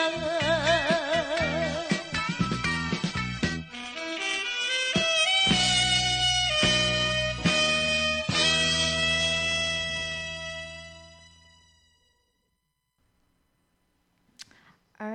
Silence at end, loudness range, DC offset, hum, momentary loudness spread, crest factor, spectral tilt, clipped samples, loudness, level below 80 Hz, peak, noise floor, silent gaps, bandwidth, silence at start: 0 s; 9 LU; under 0.1%; none; 12 LU; 18 dB; -2.5 dB/octave; under 0.1%; -24 LUFS; -48 dBFS; -10 dBFS; -77 dBFS; none; 9.6 kHz; 0 s